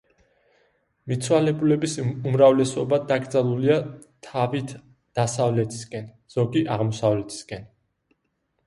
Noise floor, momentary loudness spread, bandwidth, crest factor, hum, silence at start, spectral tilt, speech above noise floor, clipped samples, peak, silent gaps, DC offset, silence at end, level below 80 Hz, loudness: -74 dBFS; 17 LU; 11.5 kHz; 20 dB; none; 1.05 s; -6.5 dB/octave; 51 dB; under 0.1%; -4 dBFS; none; under 0.1%; 1 s; -60 dBFS; -23 LUFS